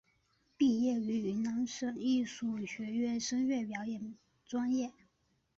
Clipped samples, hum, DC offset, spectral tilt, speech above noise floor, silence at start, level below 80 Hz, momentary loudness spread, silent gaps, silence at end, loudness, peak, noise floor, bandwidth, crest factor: under 0.1%; none; under 0.1%; -4.5 dB/octave; 42 dB; 0.6 s; -72 dBFS; 9 LU; none; 0.65 s; -35 LUFS; -20 dBFS; -76 dBFS; 7.8 kHz; 16 dB